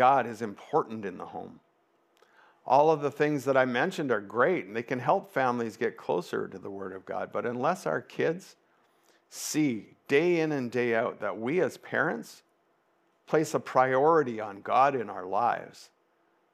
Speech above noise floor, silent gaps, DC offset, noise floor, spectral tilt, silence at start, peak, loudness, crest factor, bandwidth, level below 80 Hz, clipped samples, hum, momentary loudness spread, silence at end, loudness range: 42 dB; none; under 0.1%; -70 dBFS; -5.5 dB/octave; 0 s; -8 dBFS; -28 LUFS; 20 dB; 15.5 kHz; -86 dBFS; under 0.1%; none; 15 LU; 0.7 s; 5 LU